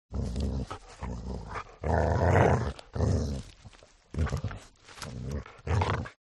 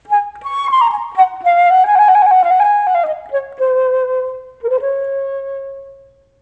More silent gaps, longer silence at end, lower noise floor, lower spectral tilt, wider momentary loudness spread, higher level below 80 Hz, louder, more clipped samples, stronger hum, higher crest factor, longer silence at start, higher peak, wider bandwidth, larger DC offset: neither; second, 0.15 s vs 0.5 s; first, -54 dBFS vs -45 dBFS; first, -7 dB/octave vs -3 dB/octave; about the same, 17 LU vs 15 LU; first, -40 dBFS vs -60 dBFS; second, -31 LUFS vs -14 LUFS; neither; neither; first, 22 dB vs 12 dB; about the same, 0.1 s vs 0.1 s; second, -8 dBFS vs -2 dBFS; first, 11.5 kHz vs 7.8 kHz; neither